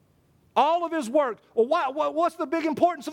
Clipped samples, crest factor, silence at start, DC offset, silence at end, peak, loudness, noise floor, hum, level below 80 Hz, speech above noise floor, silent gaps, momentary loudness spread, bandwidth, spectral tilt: under 0.1%; 18 dB; 0.55 s; under 0.1%; 0 s; -8 dBFS; -25 LUFS; -62 dBFS; none; -72 dBFS; 38 dB; none; 4 LU; 16 kHz; -4.5 dB/octave